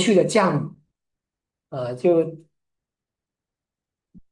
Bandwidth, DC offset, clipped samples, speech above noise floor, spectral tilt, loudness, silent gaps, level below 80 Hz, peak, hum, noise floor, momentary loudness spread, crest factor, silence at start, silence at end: 11.5 kHz; under 0.1%; under 0.1%; 68 dB; -5.5 dB/octave; -21 LUFS; none; -68 dBFS; -4 dBFS; none; -88 dBFS; 16 LU; 20 dB; 0 s; 1.95 s